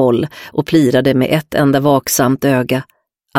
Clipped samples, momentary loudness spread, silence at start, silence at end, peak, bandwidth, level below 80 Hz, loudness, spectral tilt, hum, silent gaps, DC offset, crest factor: under 0.1%; 8 LU; 0 s; 0 s; 0 dBFS; 16.5 kHz; -48 dBFS; -14 LUFS; -5.5 dB/octave; none; none; under 0.1%; 14 dB